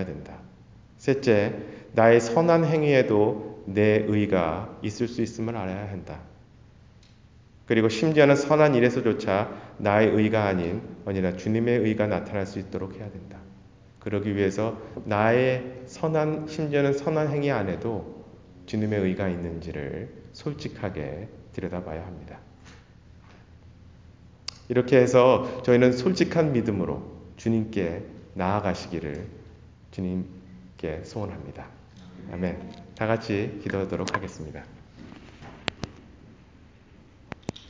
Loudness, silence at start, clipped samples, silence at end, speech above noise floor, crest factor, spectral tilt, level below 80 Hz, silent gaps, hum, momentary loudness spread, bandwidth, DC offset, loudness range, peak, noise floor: -25 LUFS; 0 s; under 0.1%; 0 s; 29 dB; 22 dB; -7 dB/octave; -50 dBFS; none; none; 20 LU; 7.6 kHz; under 0.1%; 13 LU; -4 dBFS; -53 dBFS